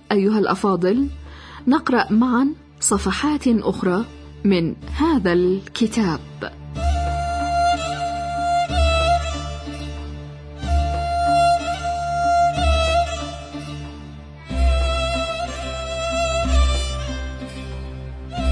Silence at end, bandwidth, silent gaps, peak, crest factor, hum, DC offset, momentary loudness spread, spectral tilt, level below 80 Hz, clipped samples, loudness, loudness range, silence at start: 0 s; 10.5 kHz; none; -4 dBFS; 16 dB; none; under 0.1%; 15 LU; -5.5 dB/octave; -28 dBFS; under 0.1%; -21 LUFS; 3 LU; 0.1 s